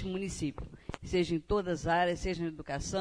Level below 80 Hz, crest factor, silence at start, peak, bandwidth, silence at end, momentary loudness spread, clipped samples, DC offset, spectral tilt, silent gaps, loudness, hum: -48 dBFS; 16 dB; 0 s; -18 dBFS; 10.5 kHz; 0 s; 12 LU; under 0.1%; under 0.1%; -5 dB/octave; none; -33 LUFS; none